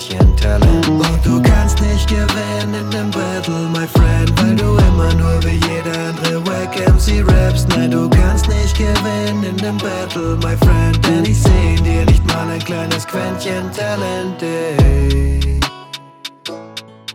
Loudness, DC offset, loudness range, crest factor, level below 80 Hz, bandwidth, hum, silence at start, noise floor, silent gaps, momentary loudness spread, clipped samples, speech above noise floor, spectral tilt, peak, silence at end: -15 LUFS; under 0.1%; 3 LU; 12 dB; -18 dBFS; 16.5 kHz; none; 0 s; -34 dBFS; none; 8 LU; under 0.1%; 20 dB; -6 dB/octave; -2 dBFS; 0 s